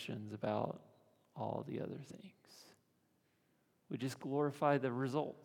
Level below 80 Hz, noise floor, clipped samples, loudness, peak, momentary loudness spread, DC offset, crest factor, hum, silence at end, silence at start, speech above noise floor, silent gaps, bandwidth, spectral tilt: -86 dBFS; -77 dBFS; under 0.1%; -40 LUFS; -18 dBFS; 23 LU; under 0.1%; 22 dB; none; 0 s; 0 s; 37 dB; none; 18 kHz; -7 dB/octave